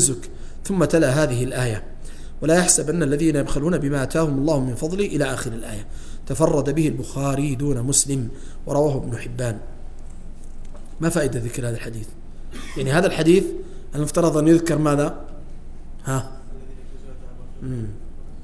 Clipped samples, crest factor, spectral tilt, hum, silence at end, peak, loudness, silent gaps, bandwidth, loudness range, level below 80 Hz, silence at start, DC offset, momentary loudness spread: under 0.1%; 22 dB; -5 dB/octave; none; 0 s; 0 dBFS; -21 LUFS; none; 11 kHz; 8 LU; -32 dBFS; 0 s; under 0.1%; 24 LU